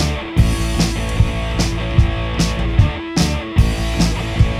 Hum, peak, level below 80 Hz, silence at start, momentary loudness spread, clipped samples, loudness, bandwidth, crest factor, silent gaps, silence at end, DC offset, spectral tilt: none; 0 dBFS; -20 dBFS; 0 s; 2 LU; under 0.1%; -18 LUFS; 14.5 kHz; 16 dB; none; 0 s; under 0.1%; -5.5 dB/octave